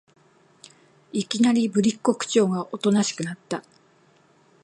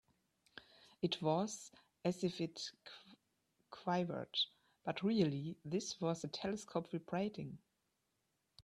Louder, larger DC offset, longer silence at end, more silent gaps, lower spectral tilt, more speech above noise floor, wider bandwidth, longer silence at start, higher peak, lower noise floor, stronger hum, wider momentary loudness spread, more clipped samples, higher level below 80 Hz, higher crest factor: first, -23 LUFS vs -41 LUFS; neither; first, 1.05 s vs 0.05 s; neither; about the same, -5 dB/octave vs -5 dB/octave; second, 36 dB vs 45 dB; about the same, 11.5 kHz vs 12.5 kHz; first, 1.15 s vs 0.55 s; first, -4 dBFS vs -22 dBFS; second, -59 dBFS vs -85 dBFS; neither; second, 12 LU vs 21 LU; neither; first, -70 dBFS vs -78 dBFS; about the same, 20 dB vs 20 dB